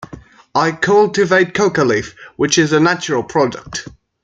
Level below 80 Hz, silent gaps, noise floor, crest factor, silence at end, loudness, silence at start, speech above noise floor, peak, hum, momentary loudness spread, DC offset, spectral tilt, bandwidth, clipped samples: -50 dBFS; none; -38 dBFS; 14 dB; 0.35 s; -15 LUFS; 0 s; 23 dB; 0 dBFS; none; 11 LU; under 0.1%; -4.5 dB/octave; 9.2 kHz; under 0.1%